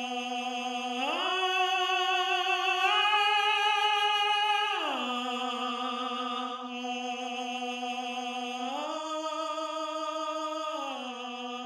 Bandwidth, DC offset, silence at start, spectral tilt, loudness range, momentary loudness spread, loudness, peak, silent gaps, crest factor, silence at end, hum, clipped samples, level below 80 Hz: 14 kHz; under 0.1%; 0 s; 0 dB/octave; 9 LU; 10 LU; -29 LUFS; -14 dBFS; none; 18 dB; 0 s; none; under 0.1%; under -90 dBFS